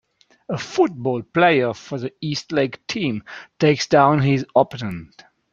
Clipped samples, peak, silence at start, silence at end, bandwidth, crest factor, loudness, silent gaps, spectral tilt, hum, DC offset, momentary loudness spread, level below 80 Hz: under 0.1%; -2 dBFS; 0.5 s; 0.5 s; 7.6 kHz; 18 dB; -20 LUFS; none; -6 dB/octave; none; under 0.1%; 14 LU; -58 dBFS